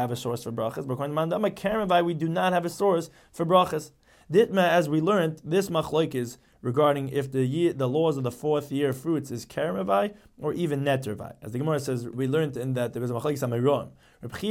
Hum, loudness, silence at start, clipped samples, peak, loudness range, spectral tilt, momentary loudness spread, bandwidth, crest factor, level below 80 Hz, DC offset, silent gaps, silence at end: none; -26 LUFS; 0 s; under 0.1%; -6 dBFS; 4 LU; -6.5 dB/octave; 11 LU; 17 kHz; 20 dB; -60 dBFS; under 0.1%; none; 0 s